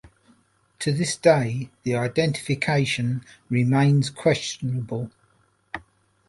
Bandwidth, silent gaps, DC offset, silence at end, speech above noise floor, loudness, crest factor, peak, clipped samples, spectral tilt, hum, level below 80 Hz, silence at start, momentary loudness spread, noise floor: 11.5 kHz; none; under 0.1%; 0.5 s; 41 dB; -23 LUFS; 20 dB; -4 dBFS; under 0.1%; -5.5 dB/octave; none; -58 dBFS; 0.8 s; 14 LU; -63 dBFS